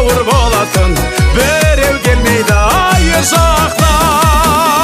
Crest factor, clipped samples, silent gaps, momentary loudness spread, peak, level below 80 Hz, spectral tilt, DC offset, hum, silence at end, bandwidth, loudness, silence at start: 10 dB; under 0.1%; none; 3 LU; 0 dBFS; -16 dBFS; -4 dB/octave; under 0.1%; none; 0 s; 16 kHz; -10 LUFS; 0 s